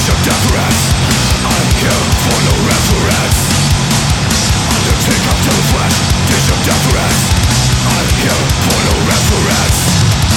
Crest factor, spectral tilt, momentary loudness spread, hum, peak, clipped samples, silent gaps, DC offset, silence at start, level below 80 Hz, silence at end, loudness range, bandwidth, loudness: 10 dB; -4 dB/octave; 1 LU; none; -2 dBFS; under 0.1%; none; under 0.1%; 0 s; -20 dBFS; 0 s; 0 LU; 19.5 kHz; -11 LUFS